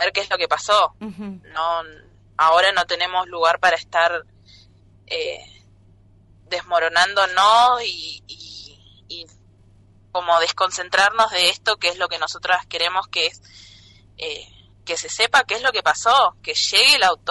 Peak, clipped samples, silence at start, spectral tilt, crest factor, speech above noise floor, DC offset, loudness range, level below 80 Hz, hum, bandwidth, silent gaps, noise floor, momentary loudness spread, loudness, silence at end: -4 dBFS; under 0.1%; 0 s; -0.5 dB/octave; 16 dB; 32 dB; under 0.1%; 5 LU; -56 dBFS; none; 11.5 kHz; none; -52 dBFS; 19 LU; -18 LUFS; 0 s